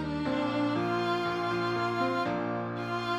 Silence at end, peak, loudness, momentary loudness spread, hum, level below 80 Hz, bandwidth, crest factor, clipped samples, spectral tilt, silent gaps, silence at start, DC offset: 0 s; -16 dBFS; -30 LUFS; 4 LU; none; -58 dBFS; 13.5 kHz; 14 dB; under 0.1%; -6.5 dB/octave; none; 0 s; under 0.1%